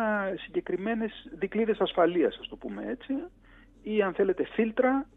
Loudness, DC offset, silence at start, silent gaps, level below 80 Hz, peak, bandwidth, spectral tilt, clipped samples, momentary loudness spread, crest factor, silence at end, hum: -29 LUFS; under 0.1%; 0 s; none; -58 dBFS; -12 dBFS; 4 kHz; -8.5 dB/octave; under 0.1%; 12 LU; 16 dB; 0.1 s; none